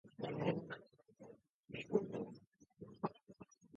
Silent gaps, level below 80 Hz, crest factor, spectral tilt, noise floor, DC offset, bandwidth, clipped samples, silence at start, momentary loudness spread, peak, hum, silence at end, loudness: 1.50-1.63 s, 2.47-2.52 s; -78 dBFS; 24 dB; -6 dB/octave; -63 dBFS; under 0.1%; 7 kHz; under 0.1%; 0.05 s; 22 LU; -22 dBFS; none; 0 s; -44 LUFS